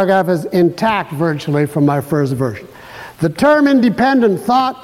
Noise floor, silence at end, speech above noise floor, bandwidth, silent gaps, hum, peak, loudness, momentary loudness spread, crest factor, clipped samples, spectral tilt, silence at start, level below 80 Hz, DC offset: -34 dBFS; 0 s; 21 dB; 16 kHz; none; none; -2 dBFS; -14 LUFS; 10 LU; 12 dB; under 0.1%; -7 dB/octave; 0 s; -50 dBFS; under 0.1%